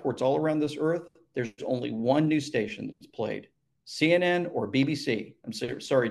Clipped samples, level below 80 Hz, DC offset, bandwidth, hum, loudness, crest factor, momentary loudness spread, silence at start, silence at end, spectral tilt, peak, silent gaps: under 0.1%; -68 dBFS; under 0.1%; 12.5 kHz; none; -28 LUFS; 20 dB; 13 LU; 0 s; 0 s; -6 dB/octave; -8 dBFS; none